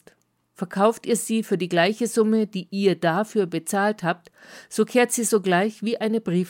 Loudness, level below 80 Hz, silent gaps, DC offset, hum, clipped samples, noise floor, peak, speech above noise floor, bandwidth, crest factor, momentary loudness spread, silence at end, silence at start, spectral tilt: -23 LUFS; -74 dBFS; none; under 0.1%; none; under 0.1%; -62 dBFS; -6 dBFS; 40 dB; 17 kHz; 18 dB; 7 LU; 0 s; 0.6 s; -4.5 dB/octave